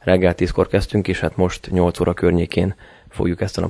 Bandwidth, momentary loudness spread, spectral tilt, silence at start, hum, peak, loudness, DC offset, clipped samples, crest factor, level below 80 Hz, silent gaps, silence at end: 11 kHz; 7 LU; -7 dB/octave; 0.05 s; none; 0 dBFS; -19 LUFS; under 0.1%; under 0.1%; 18 dB; -34 dBFS; none; 0 s